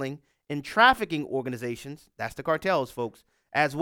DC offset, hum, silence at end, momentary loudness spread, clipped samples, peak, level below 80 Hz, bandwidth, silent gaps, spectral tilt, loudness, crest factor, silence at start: under 0.1%; none; 0 s; 16 LU; under 0.1%; -8 dBFS; -58 dBFS; 18 kHz; none; -5 dB/octave; -27 LUFS; 20 dB; 0 s